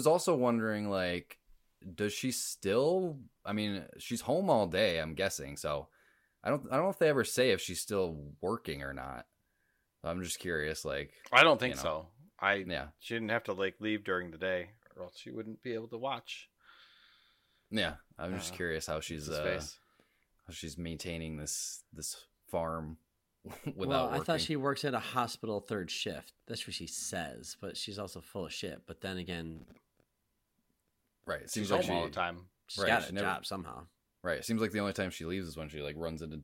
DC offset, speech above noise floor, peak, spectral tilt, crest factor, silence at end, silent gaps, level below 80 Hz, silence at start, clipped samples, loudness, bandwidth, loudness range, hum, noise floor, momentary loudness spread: under 0.1%; 46 dB; -8 dBFS; -4 dB/octave; 28 dB; 0 s; none; -60 dBFS; 0 s; under 0.1%; -35 LUFS; 16.5 kHz; 10 LU; none; -81 dBFS; 15 LU